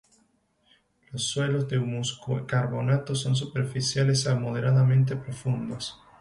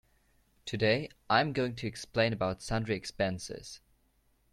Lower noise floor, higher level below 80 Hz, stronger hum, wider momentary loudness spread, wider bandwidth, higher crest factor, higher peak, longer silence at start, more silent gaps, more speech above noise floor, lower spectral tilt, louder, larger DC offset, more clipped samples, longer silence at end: second, -67 dBFS vs -71 dBFS; about the same, -60 dBFS vs -58 dBFS; neither; second, 10 LU vs 15 LU; second, 11.5 kHz vs 13.5 kHz; second, 14 dB vs 22 dB; about the same, -12 dBFS vs -12 dBFS; first, 1.1 s vs 0.65 s; neither; about the same, 42 dB vs 39 dB; about the same, -5.5 dB/octave vs -5 dB/octave; first, -26 LUFS vs -32 LUFS; neither; neither; second, 0.25 s vs 0.75 s